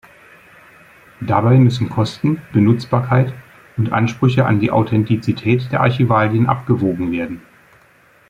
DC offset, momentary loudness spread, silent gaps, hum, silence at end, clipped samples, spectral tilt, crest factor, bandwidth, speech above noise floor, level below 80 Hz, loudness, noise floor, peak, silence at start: under 0.1%; 9 LU; none; none; 0.9 s; under 0.1%; -8.5 dB/octave; 16 dB; 7.6 kHz; 36 dB; -50 dBFS; -16 LUFS; -51 dBFS; 0 dBFS; 1.2 s